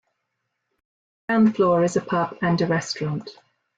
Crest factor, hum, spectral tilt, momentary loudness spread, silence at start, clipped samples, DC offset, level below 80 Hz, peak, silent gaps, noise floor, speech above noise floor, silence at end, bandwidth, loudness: 14 dB; none; -6 dB/octave; 11 LU; 1.3 s; under 0.1%; under 0.1%; -62 dBFS; -8 dBFS; none; -78 dBFS; 57 dB; 0.45 s; 9 kHz; -22 LUFS